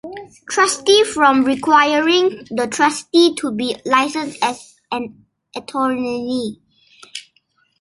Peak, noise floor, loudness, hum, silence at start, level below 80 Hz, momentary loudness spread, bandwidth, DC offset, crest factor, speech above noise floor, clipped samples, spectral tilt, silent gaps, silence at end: -2 dBFS; -61 dBFS; -17 LUFS; none; 0.05 s; -60 dBFS; 20 LU; 11.5 kHz; under 0.1%; 16 dB; 45 dB; under 0.1%; -2.5 dB/octave; none; 0.6 s